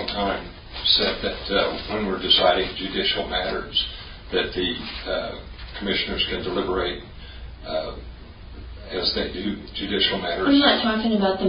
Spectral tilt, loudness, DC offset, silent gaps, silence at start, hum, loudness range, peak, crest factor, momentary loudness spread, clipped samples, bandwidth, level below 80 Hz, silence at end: -9 dB/octave; -23 LUFS; under 0.1%; none; 0 s; none; 7 LU; -2 dBFS; 22 dB; 20 LU; under 0.1%; 5.4 kHz; -40 dBFS; 0 s